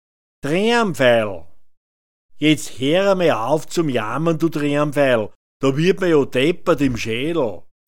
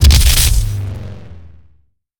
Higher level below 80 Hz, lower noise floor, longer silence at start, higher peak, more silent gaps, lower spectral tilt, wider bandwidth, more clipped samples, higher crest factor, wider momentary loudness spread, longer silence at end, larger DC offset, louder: second, -48 dBFS vs -14 dBFS; first, under -90 dBFS vs -54 dBFS; first, 0.4 s vs 0 s; about the same, -2 dBFS vs 0 dBFS; first, 1.77-2.29 s, 5.35-5.60 s vs none; first, -5.5 dB/octave vs -3 dB/octave; second, 17 kHz vs over 20 kHz; neither; about the same, 18 dB vs 14 dB; second, 7 LU vs 22 LU; first, 0.15 s vs 0 s; first, 3% vs under 0.1%; second, -18 LUFS vs -13 LUFS